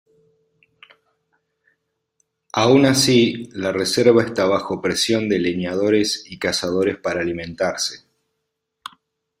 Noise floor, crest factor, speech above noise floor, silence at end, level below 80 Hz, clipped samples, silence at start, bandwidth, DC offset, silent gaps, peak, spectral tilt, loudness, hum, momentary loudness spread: -77 dBFS; 20 dB; 59 dB; 1.45 s; -58 dBFS; under 0.1%; 2.55 s; 16 kHz; under 0.1%; none; 0 dBFS; -4 dB/octave; -19 LUFS; none; 12 LU